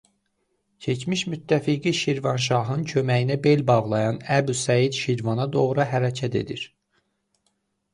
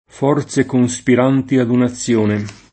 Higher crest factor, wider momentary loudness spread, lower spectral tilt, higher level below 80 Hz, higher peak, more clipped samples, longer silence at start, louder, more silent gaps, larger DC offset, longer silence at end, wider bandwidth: about the same, 18 dB vs 14 dB; first, 8 LU vs 4 LU; about the same, -5.5 dB/octave vs -6 dB/octave; second, -60 dBFS vs -52 dBFS; second, -6 dBFS vs 0 dBFS; neither; first, 0.8 s vs 0.15 s; second, -23 LUFS vs -16 LUFS; neither; neither; first, 1.25 s vs 0.2 s; first, 11.5 kHz vs 8.8 kHz